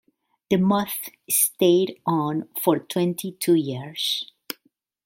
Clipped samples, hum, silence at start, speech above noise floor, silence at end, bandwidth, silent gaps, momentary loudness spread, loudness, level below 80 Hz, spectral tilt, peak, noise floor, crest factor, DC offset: under 0.1%; none; 0.5 s; 44 dB; 0.8 s; 16.5 kHz; none; 12 LU; -23 LUFS; -66 dBFS; -4.5 dB/octave; -4 dBFS; -67 dBFS; 20 dB; under 0.1%